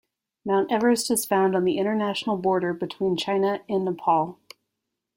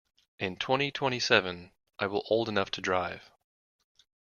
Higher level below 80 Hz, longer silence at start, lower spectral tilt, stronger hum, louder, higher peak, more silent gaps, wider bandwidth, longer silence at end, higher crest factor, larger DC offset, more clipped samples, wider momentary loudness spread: about the same, -66 dBFS vs -68 dBFS; about the same, 0.45 s vs 0.4 s; about the same, -4.5 dB/octave vs -4 dB/octave; neither; first, -24 LUFS vs -29 LUFS; about the same, -8 dBFS vs -6 dBFS; neither; first, 16.5 kHz vs 7.2 kHz; second, 0.85 s vs 1.05 s; second, 16 dB vs 26 dB; neither; neither; second, 5 LU vs 13 LU